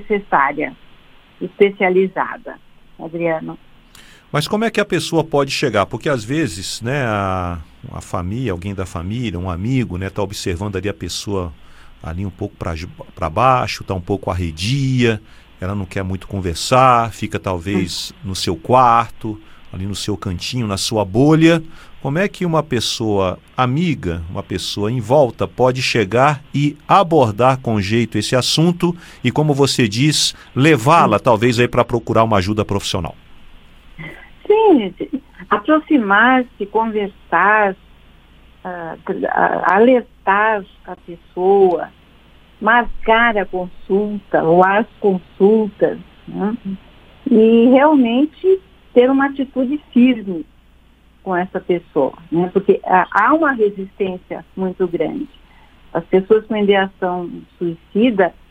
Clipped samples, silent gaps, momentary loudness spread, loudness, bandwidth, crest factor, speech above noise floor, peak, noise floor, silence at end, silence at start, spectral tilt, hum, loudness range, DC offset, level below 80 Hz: under 0.1%; none; 15 LU; -16 LUFS; 17 kHz; 16 dB; 33 dB; 0 dBFS; -49 dBFS; 0.2 s; 0 s; -5.5 dB/octave; none; 7 LU; under 0.1%; -42 dBFS